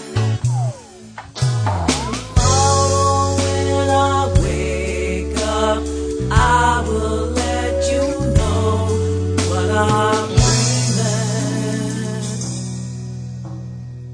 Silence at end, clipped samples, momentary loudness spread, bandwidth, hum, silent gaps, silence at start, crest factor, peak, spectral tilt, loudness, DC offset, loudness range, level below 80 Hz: 0 s; under 0.1%; 13 LU; 10.5 kHz; none; none; 0 s; 16 dB; -2 dBFS; -5 dB/octave; -18 LUFS; under 0.1%; 2 LU; -28 dBFS